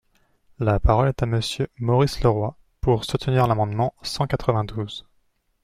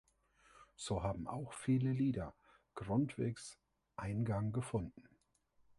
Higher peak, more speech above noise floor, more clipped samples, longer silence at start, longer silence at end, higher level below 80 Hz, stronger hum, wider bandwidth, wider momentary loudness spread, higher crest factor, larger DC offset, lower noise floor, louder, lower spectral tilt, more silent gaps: first, -6 dBFS vs -24 dBFS; first, 44 dB vs 37 dB; neither; about the same, 0.6 s vs 0.6 s; about the same, 0.65 s vs 0.75 s; first, -34 dBFS vs -60 dBFS; neither; first, 15 kHz vs 11.5 kHz; second, 9 LU vs 14 LU; about the same, 18 dB vs 18 dB; neither; second, -66 dBFS vs -75 dBFS; first, -23 LUFS vs -40 LUFS; about the same, -6.5 dB/octave vs -7 dB/octave; neither